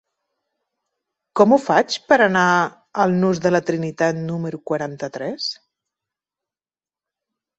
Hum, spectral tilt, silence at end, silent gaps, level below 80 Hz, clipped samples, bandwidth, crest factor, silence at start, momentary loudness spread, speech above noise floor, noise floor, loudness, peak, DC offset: none; -5.5 dB/octave; 2.05 s; none; -64 dBFS; under 0.1%; 8.2 kHz; 20 dB; 1.35 s; 12 LU; over 72 dB; under -90 dBFS; -19 LUFS; -2 dBFS; under 0.1%